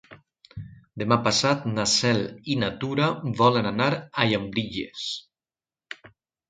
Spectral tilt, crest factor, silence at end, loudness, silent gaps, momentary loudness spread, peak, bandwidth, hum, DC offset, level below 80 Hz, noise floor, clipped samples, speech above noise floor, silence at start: -4.5 dB/octave; 24 dB; 0.4 s; -24 LUFS; none; 21 LU; -2 dBFS; 9.6 kHz; none; under 0.1%; -56 dBFS; under -90 dBFS; under 0.1%; over 66 dB; 0.1 s